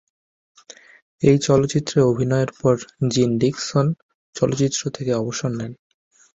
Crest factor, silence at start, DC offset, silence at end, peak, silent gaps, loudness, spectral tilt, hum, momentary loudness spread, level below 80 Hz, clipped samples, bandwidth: 18 dB; 1.2 s; under 0.1%; 0.65 s; -2 dBFS; 4.03-4.33 s; -20 LUFS; -6 dB/octave; none; 8 LU; -52 dBFS; under 0.1%; 8 kHz